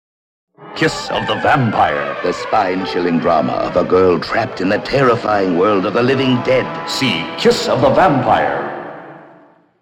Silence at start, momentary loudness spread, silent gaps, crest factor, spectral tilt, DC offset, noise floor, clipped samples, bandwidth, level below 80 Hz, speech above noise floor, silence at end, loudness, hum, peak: 0.6 s; 7 LU; none; 14 dB; -5.5 dB/octave; under 0.1%; -47 dBFS; under 0.1%; 15.5 kHz; -46 dBFS; 32 dB; 0.55 s; -15 LUFS; none; -2 dBFS